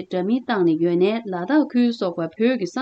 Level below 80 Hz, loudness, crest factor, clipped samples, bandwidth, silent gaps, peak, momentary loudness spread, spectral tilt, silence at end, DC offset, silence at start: -74 dBFS; -21 LUFS; 12 dB; under 0.1%; 8 kHz; none; -8 dBFS; 5 LU; -7 dB/octave; 0 s; under 0.1%; 0 s